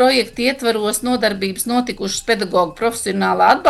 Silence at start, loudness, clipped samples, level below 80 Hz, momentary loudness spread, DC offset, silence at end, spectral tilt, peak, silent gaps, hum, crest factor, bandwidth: 0 s; -18 LUFS; under 0.1%; -48 dBFS; 5 LU; under 0.1%; 0 s; -3.5 dB/octave; -2 dBFS; none; none; 14 dB; 13 kHz